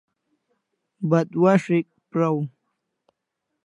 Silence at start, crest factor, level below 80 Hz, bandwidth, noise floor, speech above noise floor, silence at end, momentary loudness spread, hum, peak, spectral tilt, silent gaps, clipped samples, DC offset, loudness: 1 s; 20 dB; -76 dBFS; 10.5 kHz; -80 dBFS; 60 dB; 1.2 s; 11 LU; none; -4 dBFS; -8.5 dB/octave; none; under 0.1%; under 0.1%; -22 LUFS